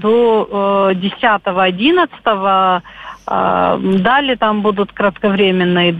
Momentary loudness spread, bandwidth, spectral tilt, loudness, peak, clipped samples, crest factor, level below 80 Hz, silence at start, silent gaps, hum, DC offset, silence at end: 5 LU; 4.9 kHz; -7.5 dB/octave; -14 LUFS; -2 dBFS; under 0.1%; 12 dB; -48 dBFS; 0 s; none; none; under 0.1%; 0 s